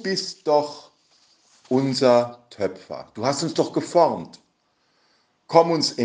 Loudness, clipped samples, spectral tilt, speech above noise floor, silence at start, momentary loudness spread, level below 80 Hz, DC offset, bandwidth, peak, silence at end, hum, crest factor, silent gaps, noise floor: -22 LUFS; under 0.1%; -5 dB/octave; 46 dB; 0 s; 15 LU; -70 dBFS; under 0.1%; 9.8 kHz; -2 dBFS; 0 s; none; 22 dB; none; -67 dBFS